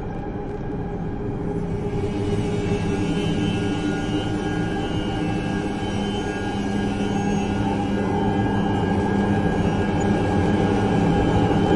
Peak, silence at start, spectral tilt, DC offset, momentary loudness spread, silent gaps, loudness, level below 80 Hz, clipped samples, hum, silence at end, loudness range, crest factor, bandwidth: -6 dBFS; 0 s; -7 dB/octave; under 0.1%; 8 LU; none; -23 LUFS; -36 dBFS; under 0.1%; none; 0 s; 4 LU; 16 dB; 11.5 kHz